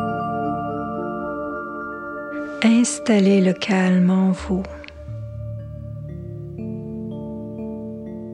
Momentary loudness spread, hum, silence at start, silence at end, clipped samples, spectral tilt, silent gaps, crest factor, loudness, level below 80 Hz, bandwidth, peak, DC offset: 17 LU; none; 0 s; 0 s; under 0.1%; -6 dB/octave; none; 18 dB; -22 LUFS; -46 dBFS; 11 kHz; -4 dBFS; under 0.1%